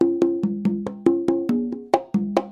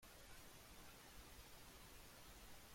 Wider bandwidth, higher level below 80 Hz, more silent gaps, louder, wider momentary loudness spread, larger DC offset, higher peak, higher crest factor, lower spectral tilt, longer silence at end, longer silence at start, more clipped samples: second, 9.8 kHz vs 16.5 kHz; first, -60 dBFS vs -68 dBFS; neither; first, -23 LUFS vs -61 LUFS; first, 4 LU vs 0 LU; neither; first, -2 dBFS vs -46 dBFS; first, 20 dB vs 14 dB; first, -8 dB/octave vs -2.5 dB/octave; about the same, 0 s vs 0 s; about the same, 0 s vs 0 s; neither